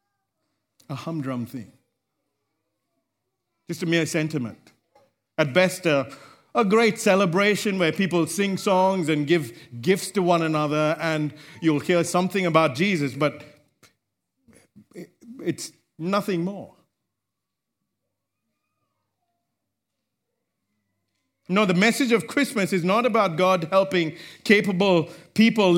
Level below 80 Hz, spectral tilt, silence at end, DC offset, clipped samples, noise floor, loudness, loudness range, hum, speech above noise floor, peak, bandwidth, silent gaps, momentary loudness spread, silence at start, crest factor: -72 dBFS; -5 dB/octave; 0 s; under 0.1%; under 0.1%; -84 dBFS; -22 LUFS; 11 LU; none; 62 dB; -2 dBFS; 16.5 kHz; none; 13 LU; 0.9 s; 22 dB